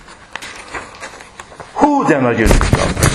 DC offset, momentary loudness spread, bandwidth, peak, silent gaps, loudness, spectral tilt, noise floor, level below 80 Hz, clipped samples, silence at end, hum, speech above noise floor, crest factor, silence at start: under 0.1%; 20 LU; 14 kHz; 0 dBFS; none; -13 LUFS; -5 dB/octave; -36 dBFS; -22 dBFS; 0.1%; 0 s; none; 23 dB; 16 dB; 0.1 s